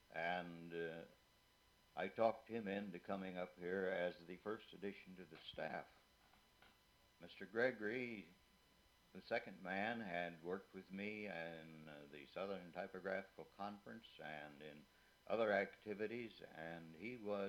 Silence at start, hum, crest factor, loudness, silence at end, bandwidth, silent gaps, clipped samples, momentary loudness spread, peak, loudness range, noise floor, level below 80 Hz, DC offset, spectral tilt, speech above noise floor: 0.1 s; none; 24 dB; -47 LUFS; 0 s; 18 kHz; none; under 0.1%; 17 LU; -24 dBFS; 6 LU; -74 dBFS; -82 dBFS; under 0.1%; -6.5 dB/octave; 27 dB